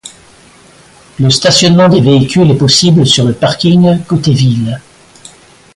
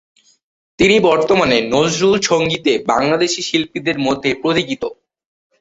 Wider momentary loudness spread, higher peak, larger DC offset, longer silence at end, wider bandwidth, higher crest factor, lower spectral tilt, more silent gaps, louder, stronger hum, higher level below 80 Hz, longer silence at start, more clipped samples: about the same, 6 LU vs 6 LU; about the same, 0 dBFS vs -2 dBFS; neither; first, 0.95 s vs 0.65 s; first, 11.5 kHz vs 8.2 kHz; second, 10 dB vs 16 dB; about the same, -5 dB/octave vs -4 dB/octave; neither; first, -8 LUFS vs -15 LUFS; neither; first, -42 dBFS vs -48 dBFS; second, 0.05 s vs 0.8 s; neither